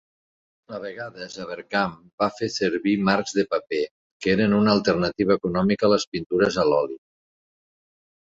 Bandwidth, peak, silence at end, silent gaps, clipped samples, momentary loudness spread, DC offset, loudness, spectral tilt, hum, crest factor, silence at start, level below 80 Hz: 7.8 kHz; -6 dBFS; 1.3 s; 2.13-2.18 s, 3.91-4.20 s, 6.07-6.12 s, 6.26-6.30 s; under 0.1%; 15 LU; under 0.1%; -23 LUFS; -5.5 dB/octave; none; 18 dB; 0.7 s; -56 dBFS